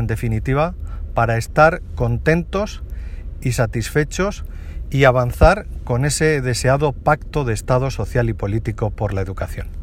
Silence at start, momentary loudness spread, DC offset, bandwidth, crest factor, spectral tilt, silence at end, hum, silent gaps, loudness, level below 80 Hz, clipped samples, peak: 0 s; 13 LU; under 0.1%; 16 kHz; 18 dB; -6 dB/octave; 0 s; none; none; -19 LUFS; -28 dBFS; under 0.1%; 0 dBFS